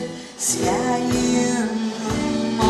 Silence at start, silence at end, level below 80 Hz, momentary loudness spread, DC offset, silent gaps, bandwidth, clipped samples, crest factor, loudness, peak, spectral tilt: 0 s; 0 s; -42 dBFS; 5 LU; under 0.1%; none; 13.5 kHz; under 0.1%; 16 dB; -21 LUFS; -6 dBFS; -4 dB/octave